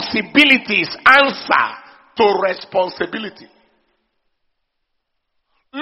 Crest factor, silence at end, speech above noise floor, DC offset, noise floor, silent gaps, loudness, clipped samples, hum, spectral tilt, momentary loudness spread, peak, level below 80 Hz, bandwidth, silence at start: 18 dB; 0 s; 57 dB; under 0.1%; -72 dBFS; none; -14 LUFS; under 0.1%; none; 0 dB/octave; 17 LU; 0 dBFS; -58 dBFS; 6.2 kHz; 0 s